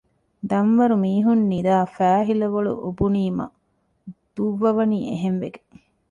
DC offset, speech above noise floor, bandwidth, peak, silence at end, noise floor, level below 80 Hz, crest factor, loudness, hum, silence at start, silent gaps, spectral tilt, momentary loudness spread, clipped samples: under 0.1%; 48 dB; 7.4 kHz; -6 dBFS; 0.55 s; -68 dBFS; -50 dBFS; 14 dB; -21 LUFS; none; 0.45 s; none; -9 dB/octave; 10 LU; under 0.1%